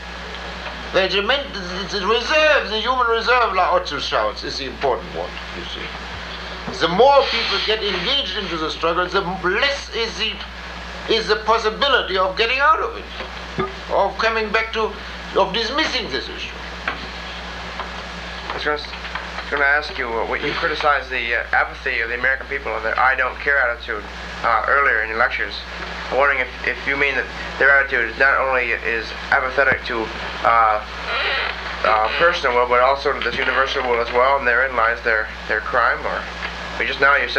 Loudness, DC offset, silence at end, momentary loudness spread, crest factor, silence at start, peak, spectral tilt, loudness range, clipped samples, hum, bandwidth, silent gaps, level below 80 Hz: -19 LUFS; under 0.1%; 0 s; 13 LU; 18 dB; 0 s; -2 dBFS; -3.5 dB/octave; 5 LU; under 0.1%; none; 13.5 kHz; none; -38 dBFS